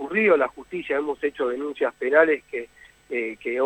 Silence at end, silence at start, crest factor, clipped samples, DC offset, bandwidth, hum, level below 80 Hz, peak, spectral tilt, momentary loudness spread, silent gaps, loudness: 0 s; 0 s; 18 dB; under 0.1%; under 0.1%; 8.4 kHz; none; -64 dBFS; -4 dBFS; -6 dB/octave; 15 LU; none; -23 LUFS